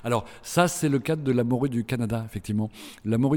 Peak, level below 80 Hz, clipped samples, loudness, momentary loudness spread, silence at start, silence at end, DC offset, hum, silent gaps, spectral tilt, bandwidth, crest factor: -6 dBFS; -54 dBFS; under 0.1%; -26 LUFS; 7 LU; 0 s; 0 s; under 0.1%; none; none; -6 dB/octave; 18.5 kHz; 18 dB